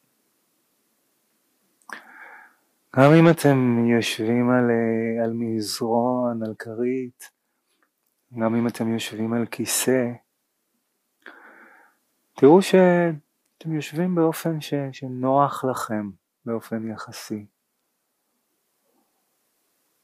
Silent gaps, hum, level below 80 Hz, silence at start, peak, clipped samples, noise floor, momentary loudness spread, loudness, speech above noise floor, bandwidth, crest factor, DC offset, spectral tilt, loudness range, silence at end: none; none; -74 dBFS; 1.9 s; -2 dBFS; under 0.1%; -74 dBFS; 20 LU; -22 LUFS; 53 dB; 15.5 kHz; 22 dB; under 0.1%; -6 dB/octave; 10 LU; 2.6 s